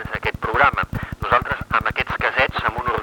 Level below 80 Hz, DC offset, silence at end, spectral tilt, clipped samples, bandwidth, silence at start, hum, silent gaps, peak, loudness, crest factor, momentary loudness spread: -38 dBFS; under 0.1%; 0 s; -6 dB/octave; under 0.1%; 20 kHz; 0 s; none; none; -2 dBFS; -20 LUFS; 20 dB; 8 LU